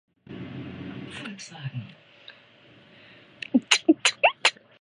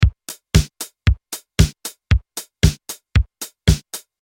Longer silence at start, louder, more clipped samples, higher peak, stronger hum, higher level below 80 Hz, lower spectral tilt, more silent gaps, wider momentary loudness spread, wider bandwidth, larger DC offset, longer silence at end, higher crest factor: first, 0.3 s vs 0 s; about the same, -22 LUFS vs -20 LUFS; neither; about the same, -2 dBFS vs 0 dBFS; neither; second, -66 dBFS vs -24 dBFS; second, -3 dB/octave vs -5 dB/octave; neither; first, 20 LU vs 13 LU; second, 11 kHz vs 17 kHz; neither; about the same, 0.3 s vs 0.25 s; first, 28 dB vs 20 dB